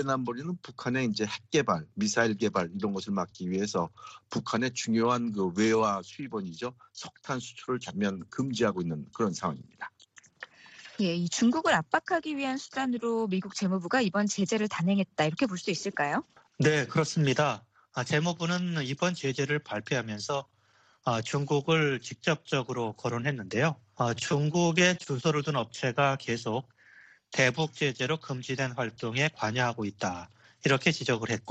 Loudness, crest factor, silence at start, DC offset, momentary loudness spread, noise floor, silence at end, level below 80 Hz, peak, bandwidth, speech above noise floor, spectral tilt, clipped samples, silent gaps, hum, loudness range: -29 LUFS; 22 dB; 0 s; under 0.1%; 10 LU; -65 dBFS; 0 s; -68 dBFS; -8 dBFS; 8.8 kHz; 36 dB; -5 dB/octave; under 0.1%; none; none; 3 LU